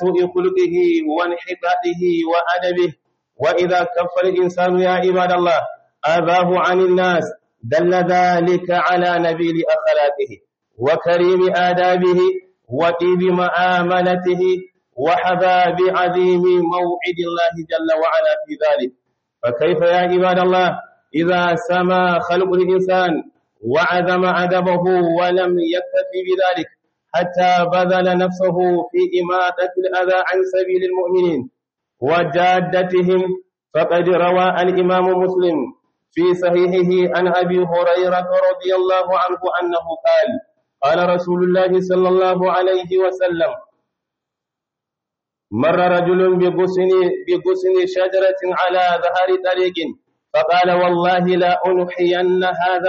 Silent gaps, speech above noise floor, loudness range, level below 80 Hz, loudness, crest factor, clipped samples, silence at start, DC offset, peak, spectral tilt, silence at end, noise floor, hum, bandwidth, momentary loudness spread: none; 68 dB; 2 LU; -62 dBFS; -16 LUFS; 10 dB; under 0.1%; 0 s; under 0.1%; -6 dBFS; -4.5 dB/octave; 0 s; -83 dBFS; none; 7 kHz; 6 LU